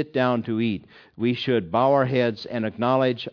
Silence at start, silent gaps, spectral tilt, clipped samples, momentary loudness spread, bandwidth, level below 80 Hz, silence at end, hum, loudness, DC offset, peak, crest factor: 0 s; none; -8 dB/octave; under 0.1%; 8 LU; 5.4 kHz; -64 dBFS; 0 s; none; -23 LUFS; under 0.1%; -6 dBFS; 16 dB